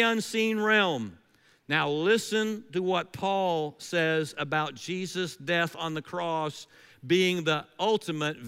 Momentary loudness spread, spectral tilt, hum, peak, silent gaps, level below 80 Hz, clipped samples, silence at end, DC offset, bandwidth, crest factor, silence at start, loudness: 9 LU; -4.5 dB/octave; none; -10 dBFS; none; -74 dBFS; under 0.1%; 0 s; under 0.1%; 16 kHz; 18 dB; 0 s; -28 LUFS